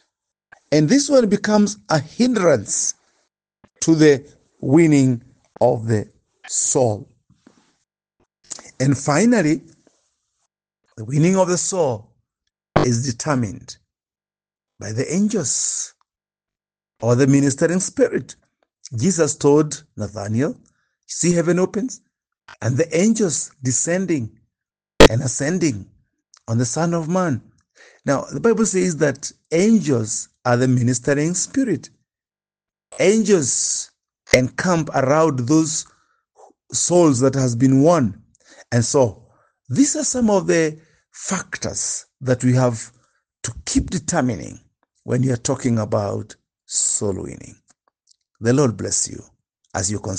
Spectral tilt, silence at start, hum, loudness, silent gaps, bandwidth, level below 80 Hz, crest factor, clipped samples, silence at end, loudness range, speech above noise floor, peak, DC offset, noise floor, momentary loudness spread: -5 dB/octave; 0.7 s; none; -19 LUFS; none; 10 kHz; -42 dBFS; 20 dB; under 0.1%; 0 s; 5 LU; over 72 dB; 0 dBFS; under 0.1%; under -90 dBFS; 15 LU